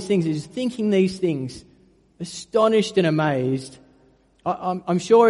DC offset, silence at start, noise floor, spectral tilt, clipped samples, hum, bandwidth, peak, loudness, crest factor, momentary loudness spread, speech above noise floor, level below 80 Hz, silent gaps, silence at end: under 0.1%; 0 s; -57 dBFS; -6.5 dB/octave; under 0.1%; none; 11.5 kHz; -4 dBFS; -22 LUFS; 18 dB; 16 LU; 37 dB; -60 dBFS; none; 0 s